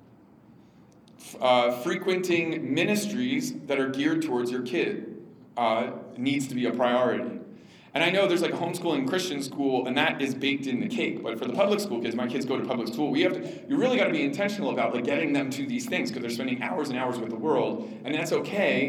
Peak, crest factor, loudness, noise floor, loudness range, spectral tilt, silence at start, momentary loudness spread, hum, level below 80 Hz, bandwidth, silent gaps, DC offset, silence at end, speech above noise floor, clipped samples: -8 dBFS; 20 dB; -27 LUFS; -54 dBFS; 2 LU; -5 dB/octave; 1.2 s; 7 LU; none; -78 dBFS; 19 kHz; none; under 0.1%; 0 s; 28 dB; under 0.1%